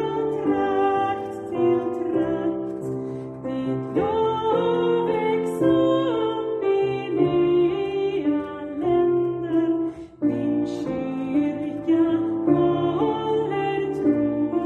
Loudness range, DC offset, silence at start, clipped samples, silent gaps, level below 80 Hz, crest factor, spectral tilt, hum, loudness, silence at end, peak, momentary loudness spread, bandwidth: 3 LU; under 0.1%; 0 s; under 0.1%; none; -56 dBFS; 16 dB; -8 dB/octave; none; -23 LUFS; 0 s; -8 dBFS; 7 LU; 8.6 kHz